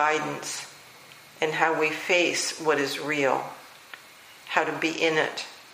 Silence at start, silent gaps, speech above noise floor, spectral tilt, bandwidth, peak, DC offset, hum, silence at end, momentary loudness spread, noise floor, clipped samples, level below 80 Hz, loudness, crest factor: 0 s; none; 24 dB; -2.5 dB/octave; 15.5 kHz; -6 dBFS; under 0.1%; none; 0 s; 22 LU; -49 dBFS; under 0.1%; -76 dBFS; -25 LUFS; 22 dB